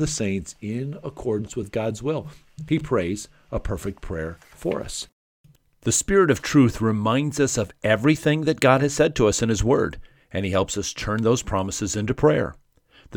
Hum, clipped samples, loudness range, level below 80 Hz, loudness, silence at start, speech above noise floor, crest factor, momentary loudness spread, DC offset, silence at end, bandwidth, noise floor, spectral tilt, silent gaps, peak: none; under 0.1%; 8 LU; -40 dBFS; -23 LUFS; 0 s; 32 dB; 20 dB; 13 LU; under 0.1%; 0 s; 18.5 kHz; -54 dBFS; -5 dB/octave; 5.12-5.44 s; -2 dBFS